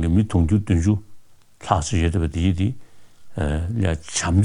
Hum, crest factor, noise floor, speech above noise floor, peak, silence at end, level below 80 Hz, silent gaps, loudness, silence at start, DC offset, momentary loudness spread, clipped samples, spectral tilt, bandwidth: none; 20 dB; -44 dBFS; 24 dB; -2 dBFS; 0 s; -32 dBFS; none; -22 LUFS; 0 s; under 0.1%; 8 LU; under 0.1%; -6 dB/octave; 11 kHz